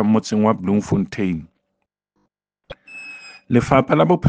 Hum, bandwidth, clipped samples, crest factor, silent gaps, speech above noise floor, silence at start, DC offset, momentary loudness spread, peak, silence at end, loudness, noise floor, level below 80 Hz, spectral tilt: none; 9.2 kHz; under 0.1%; 20 dB; none; 59 dB; 0 s; under 0.1%; 19 LU; 0 dBFS; 0 s; -19 LUFS; -76 dBFS; -48 dBFS; -7.5 dB/octave